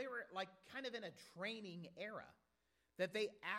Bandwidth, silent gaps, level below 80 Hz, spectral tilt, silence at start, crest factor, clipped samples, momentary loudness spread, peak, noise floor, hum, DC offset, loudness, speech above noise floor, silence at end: 16 kHz; none; -88 dBFS; -4.5 dB/octave; 0 s; 22 dB; under 0.1%; 12 LU; -28 dBFS; -84 dBFS; none; under 0.1%; -48 LUFS; 36 dB; 0 s